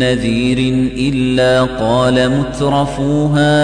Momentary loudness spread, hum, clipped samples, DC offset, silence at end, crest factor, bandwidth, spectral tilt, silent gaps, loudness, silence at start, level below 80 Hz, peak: 4 LU; none; under 0.1%; under 0.1%; 0 s; 12 dB; 10 kHz; -6 dB/octave; none; -14 LUFS; 0 s; -32 dBFS; -2 dBFS